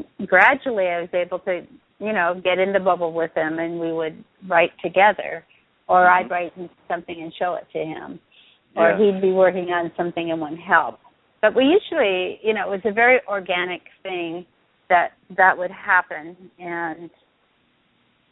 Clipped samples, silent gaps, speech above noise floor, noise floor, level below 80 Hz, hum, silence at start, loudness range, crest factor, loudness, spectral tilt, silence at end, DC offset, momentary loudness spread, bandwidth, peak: under 0.1%; none; 43 dB; -63 dBFS; -64 dBFS; none; 0 s; 3 LU; 22 dB; -20 LUFS; -7.5 dB/octave; 1.25 s; under 0.1%; 15 LU; 4.1 kHz; 0 dBFS